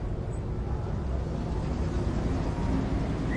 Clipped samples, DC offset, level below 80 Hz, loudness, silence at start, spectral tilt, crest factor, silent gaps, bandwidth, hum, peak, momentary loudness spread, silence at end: under 0.1%; under 0.1%; -34 dBFS; -31 LUFS; 0 s; -8 dB/octave; 12 dB; none; 9.4 kHz; none; -16 dBFS; 4 LU; 0 s